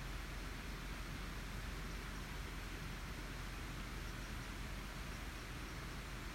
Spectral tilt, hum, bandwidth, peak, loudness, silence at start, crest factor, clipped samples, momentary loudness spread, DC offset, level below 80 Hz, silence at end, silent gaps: -4 dB/octave; none; 16 kHz; -34 dBFS; -48 LUFS; 0 s; 12 dB; under 0.1%; 1 LU; under 0.1%; -50 dBFS; 0 s; none